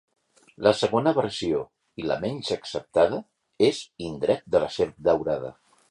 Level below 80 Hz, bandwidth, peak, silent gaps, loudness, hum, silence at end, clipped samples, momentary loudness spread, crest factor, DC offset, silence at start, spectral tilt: -56 dBFS; 11 kHz; -4 dBFS; none; -25 LUFS; none; 0.4 s; under 0.1%; 11 LU; 22 dB; under 0.1%; 0.6 s; -5.5 dB/octave